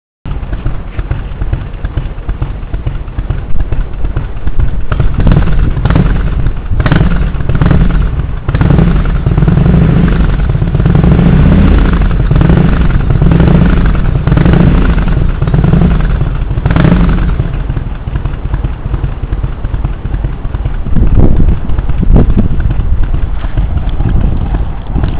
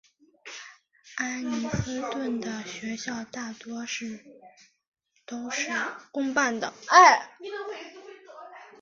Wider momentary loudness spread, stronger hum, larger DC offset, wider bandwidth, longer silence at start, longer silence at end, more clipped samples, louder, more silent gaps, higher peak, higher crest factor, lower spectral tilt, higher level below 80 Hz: second, 11 LU vs 25 LU; neither; neither; second, 4 kHz vs 7.6 kHz; second, 0.25 s vs 0.45 s; second, 0 s vs 0.15 s; first, 2% vs under 0.1%; first, -12 LUFS vs -26 LUFS; second, none vs 4.88-4.92 s; first, 0 dBFS vs -4 dBFS; second, 8 dB vs 26 dB; first, -12 dB/octave vs -3 dB/octave; first, -12 dBFS vs -58 dBFS